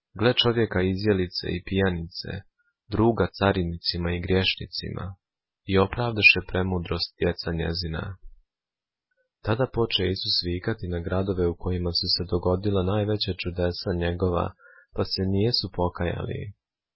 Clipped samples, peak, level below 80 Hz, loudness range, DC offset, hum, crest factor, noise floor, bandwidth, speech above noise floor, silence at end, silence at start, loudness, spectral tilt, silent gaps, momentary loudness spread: under 0.1%; -4 dBFS; -40 dBFS; 5 LU; under 0.1%; none; 22 dB; under -90 dBFS; 5.8 kHz; over 65 dB; 0.45 s; 0.15 s; -25 LUFS; -9.5 dB/octave; none; 11 LU